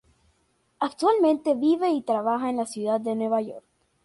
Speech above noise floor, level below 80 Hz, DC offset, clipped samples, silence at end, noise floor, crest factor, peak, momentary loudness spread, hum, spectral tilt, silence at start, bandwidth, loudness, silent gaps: 45 dB; -70 dBFS; under 0.1%; under 0.1%; 0.45 s; -68 dBFS; 14 dB; -10 dBFS; 9 LU; none; -5.5 dB/octave; 0.8 s; 11.5 kHz; -24 LUFS; none